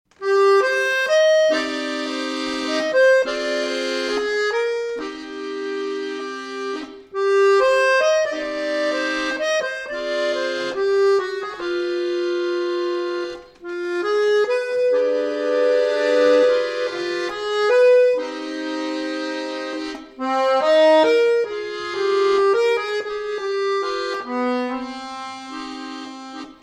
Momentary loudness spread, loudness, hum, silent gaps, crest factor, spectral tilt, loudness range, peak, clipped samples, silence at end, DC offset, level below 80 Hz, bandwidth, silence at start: 14 LU; -20 LUFS; none; none; 14 dB; -2 dB/octave; 6 LU; -6 dBFS; under 0.1%; 0.1 s; under 0.1%; -62 dBFS; 12 kHz; 0.2 s